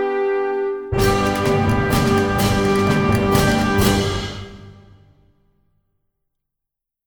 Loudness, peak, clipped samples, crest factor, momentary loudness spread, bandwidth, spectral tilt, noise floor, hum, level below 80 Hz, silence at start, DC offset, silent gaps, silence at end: -18 LUFS; -2 dBFS; under 0.1%; 18 dB; 7 LU; over 20 kHz; -5.5 dB/octave; -83 dBFS; none; -34 dBFS; 0 s; under 0.1%; none; 2.35 s